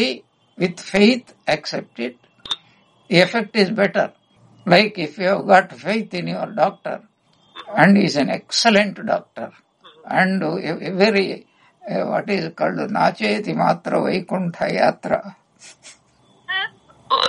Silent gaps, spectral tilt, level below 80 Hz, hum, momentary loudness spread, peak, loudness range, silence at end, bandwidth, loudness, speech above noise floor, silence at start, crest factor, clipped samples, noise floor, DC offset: none; -5 dB/octave; -62 dBFS; none; 14 LU; 0 dBFS; 4 LU; 0 s; 11.5 kHz; -19 LUFS; 37 dB; 0 s; 20 dB; under 0.1%; -56 dBFS; under 0.1%